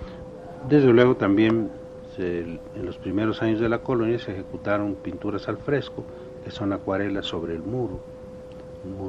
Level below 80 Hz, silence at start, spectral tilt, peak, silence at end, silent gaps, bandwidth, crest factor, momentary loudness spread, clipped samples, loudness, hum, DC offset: -50 dBFS; 0 s; -8 dB/octave; -4 dBFS; 0 s; none; 7.8 kHz; 22 dB; 20 LU; under 0.1%; -24 LUFS; none; under 0.1%